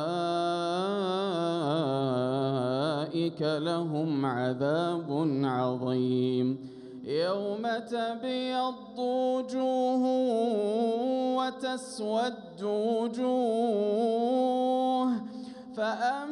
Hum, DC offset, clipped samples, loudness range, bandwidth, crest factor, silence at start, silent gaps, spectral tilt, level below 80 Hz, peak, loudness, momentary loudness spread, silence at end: none; under 0.1%; under 0.1%; 2 LU; 11 kHz; 12 dB; 0 s; none; -6.5 dB/octave; -76 dBFS; -16 dBFS; -29 LUFS; 6 LU; 0 s